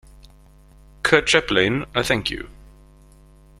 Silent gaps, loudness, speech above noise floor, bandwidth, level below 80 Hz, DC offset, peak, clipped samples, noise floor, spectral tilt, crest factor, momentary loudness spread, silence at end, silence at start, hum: none; -19 LUFS; 29 dB; 15.5 kHz; -44 dBFS; under 0.1%; 0 dBFS; under 0.1%; -49 dBFS; -3.5 dB/octave; 22 dB; 13 LU; 1.1 s; 1.05 s; none